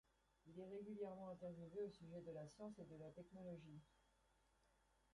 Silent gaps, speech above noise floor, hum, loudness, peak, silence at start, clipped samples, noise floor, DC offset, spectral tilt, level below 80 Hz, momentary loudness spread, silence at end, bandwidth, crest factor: none; 25 dB; none; -56 LUFS; -40 dBFS; 0.45 s; under 0.1%; -81 dBFS; under 0.1%; -7.5 dB/octave; -82 dBFS; 7 LU; 0.45 s; 11 kHz; 16 dB